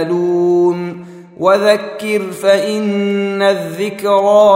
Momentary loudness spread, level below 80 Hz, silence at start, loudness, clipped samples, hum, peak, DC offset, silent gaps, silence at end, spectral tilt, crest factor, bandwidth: 8 LU; -64 dBFS; 0 s; -14 LUFS; under 0.1%; none; 0 dBFS; under 0.1%; none; 0 s; -5.5 dB/octave; 12 dB; 16 kHz